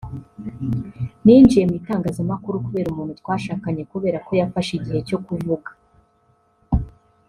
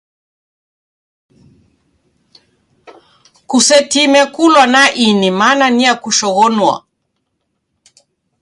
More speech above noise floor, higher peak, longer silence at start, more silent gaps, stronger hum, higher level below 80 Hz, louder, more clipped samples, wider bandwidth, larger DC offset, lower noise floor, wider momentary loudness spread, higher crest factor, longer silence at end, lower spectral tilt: second, 42 dB vs 59 dB; about the same, -2 dBFS vs 0 dBFS; second, 0.05 s vs 3.5 s; neither; neither; first, -38 dBFS vs -60 dBFS; second, -20 LUFS vs -10 LUFS; neither; about the same, 11.5 kHz vs 11.5 kHz; neither; second, -61 dBFS vs -69 dBFS; first, 16 LU vs 6 LU; first, 20 dB vs 14 dB; second, 0.4 s vs 1.65 s; first, -8 dB/octave vs -2.5 dB/octave